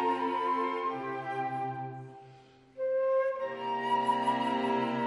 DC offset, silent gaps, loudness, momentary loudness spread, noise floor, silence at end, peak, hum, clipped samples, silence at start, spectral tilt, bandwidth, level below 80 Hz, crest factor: under 0.1%; none; -31 LUFS; 8 LU; -56 dBFS; 0 s; -16 dBFS; none; under 0.1%; 0 s; -6 dB/octave; 11.5 kHz; -76 dBFS; 14 dB